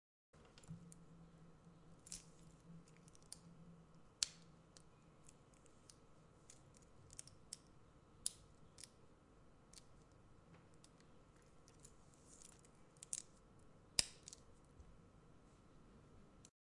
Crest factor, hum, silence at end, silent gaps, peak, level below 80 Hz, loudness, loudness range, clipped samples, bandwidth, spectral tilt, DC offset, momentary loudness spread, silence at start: 44 dB; none; 0.25 s; none; -12 dBFS; -72 dBFS; -49 LUFS; 16 LU; under 0.1%; 12 kHz; -1 dB/octave; under 0.1%; 21 LU; 0.35 s